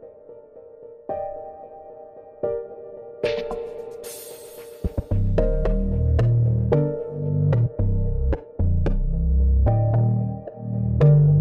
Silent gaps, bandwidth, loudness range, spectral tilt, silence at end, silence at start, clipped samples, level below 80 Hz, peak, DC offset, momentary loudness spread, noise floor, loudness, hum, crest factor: none; 14.5 kHz; 10 LU; -9 dB/octave; 0 s; 0 s; under 0.1%; -26 dBFS; -6 dBFS; under 0.1%; 20 LU; -44 dBFS; -23 LUFS; none; 14 dB